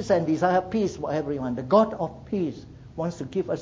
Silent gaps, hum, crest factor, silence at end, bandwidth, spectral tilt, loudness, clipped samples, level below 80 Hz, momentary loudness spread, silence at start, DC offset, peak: none; none; 18 dB; 0 s; 7.8 kHz; -7 dB/octave; -26 LUFS; under 0.1%; -52 dBFS; 11 LU; 0 s; under 0.1%; -6 dBFS